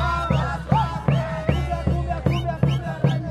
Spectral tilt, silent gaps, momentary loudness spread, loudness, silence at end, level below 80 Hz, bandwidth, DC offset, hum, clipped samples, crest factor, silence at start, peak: -7.5 dB/octave; none; 2 LU; -23 LUFS; 0 s; -32 dBFS; 9.4 kHz; under 0.1%; none; under 0.1%; 16 dB; 0 s; -4 dBFS